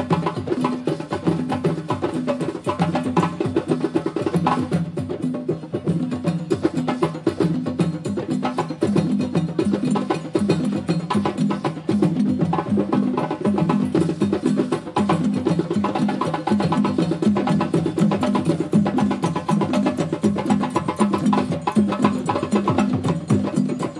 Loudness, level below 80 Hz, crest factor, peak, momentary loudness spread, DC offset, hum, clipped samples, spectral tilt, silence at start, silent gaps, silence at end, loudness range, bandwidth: -22 LUFS; -58 dBFS; 18 dB; -2 dBFS; 4 LU; under 0.1%; none; under 0.1%; -7.5 dB/octave; 0 s; none; 0 s; 3 LU; 11.5 kHz